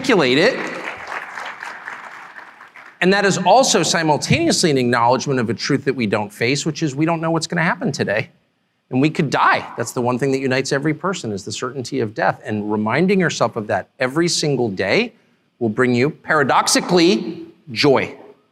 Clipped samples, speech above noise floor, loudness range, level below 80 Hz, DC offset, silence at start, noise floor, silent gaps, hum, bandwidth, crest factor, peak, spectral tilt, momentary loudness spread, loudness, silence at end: under 0.1%; 48 dB; 4 LU; -60 dBFS; under 0.1%; 0 s; -65 dBFS; none; none; 15 kHz; 16 dB; -2 dBFS; -4.5 dB/octave; 13 LU; -18 LUFS; 0.2 s